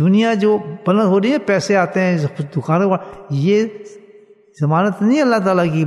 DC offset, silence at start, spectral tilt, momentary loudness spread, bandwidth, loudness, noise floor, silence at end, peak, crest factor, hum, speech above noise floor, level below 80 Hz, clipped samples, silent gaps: under 0.1%; 0 s; -7 dB/octave; 8 LU; 11.5 kHz; -16 LUFS; -46 dBFS; 0 s; -2 dBFS; 14 dB; none; 31 dB; -62 dBFS; under 0.1%; none